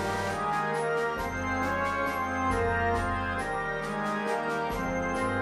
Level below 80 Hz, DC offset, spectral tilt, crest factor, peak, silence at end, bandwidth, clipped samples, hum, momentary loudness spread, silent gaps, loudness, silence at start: -46 dBFS; under 0.1%; -5.5 dB/octave; 14 dB; -16 dBFS; 0 s; 15.5 kHz; under 0.1%; none; 4 LU; none; -29 LUFS; 0 s